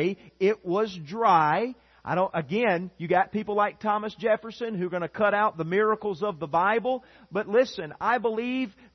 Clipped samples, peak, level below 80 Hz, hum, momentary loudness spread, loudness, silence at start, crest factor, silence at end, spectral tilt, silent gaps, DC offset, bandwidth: under 0.1%; -8 dBFS; -66 dBFS; none; 8 LU; -26 LUFS; 0 s; 18 dB; 0.25 s; -7 dB/octave; none; under 0.1%; 6.4 kHz